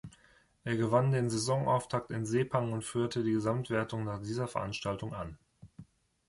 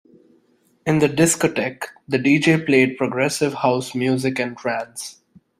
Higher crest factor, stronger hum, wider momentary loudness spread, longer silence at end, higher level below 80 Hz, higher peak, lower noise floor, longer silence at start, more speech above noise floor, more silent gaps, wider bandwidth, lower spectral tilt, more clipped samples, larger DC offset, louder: about the same, 20 dB vs 18 dB; neither; about the same, 10 LU vs 12 LU; about the same, 0.45 s vs 0.45 s; about the same, -60 dBFS vs -58 dBFS; second, -14 dBFS vs -2 dBFS; first, -65 dBFS vs -60 dBFS; second, 0.05 s vs 0.85 s; second, 33 dB vs 41 dB; neither; second, 11.5 kHz vs 15.5 kHz; about the same, -6 dB/octave vs -5 dB/octave; neither; neither; second, -33 LUFS vs -19 LUFS